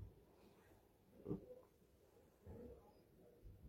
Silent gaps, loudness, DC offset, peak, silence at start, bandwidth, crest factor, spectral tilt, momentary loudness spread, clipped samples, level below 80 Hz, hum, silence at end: none; -57 LUFS; under 0.1%; -34 dBFS; 0 s; 16.5 kHz; 26 dB; -8.5 dB/octave; 18 LU; under 0.1%; -70 dBFS; none; 0 s